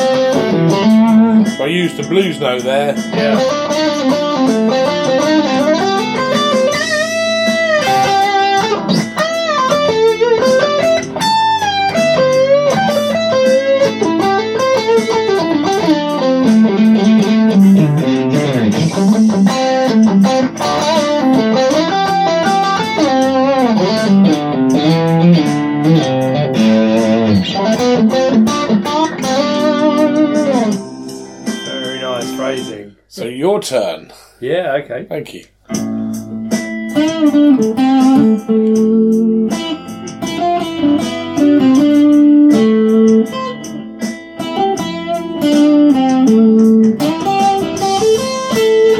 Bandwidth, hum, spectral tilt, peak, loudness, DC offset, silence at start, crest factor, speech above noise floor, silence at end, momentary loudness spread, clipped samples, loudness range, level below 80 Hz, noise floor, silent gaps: 14.5 kHz; none; -5.5 dB/octave; 0 dBFS; -12 LUFS; under 0.1%; 0 s; 12 dB; 21 dB; 0 s; 10 LU; under 0.1%; 5 LU; -52 dBFS; -33 dBFS; none